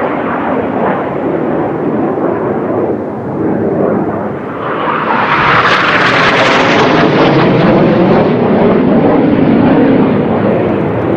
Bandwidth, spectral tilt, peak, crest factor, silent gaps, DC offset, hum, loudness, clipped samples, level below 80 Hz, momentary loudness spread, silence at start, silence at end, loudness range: 8.6 kHz; -7 dB/octave; 0 dBFS; 10 dB; none; under 0.1%; none; -10 LUFS; under 0.1%; -38 dBFS; 7 LU; 0 s; 0 s; 6 LU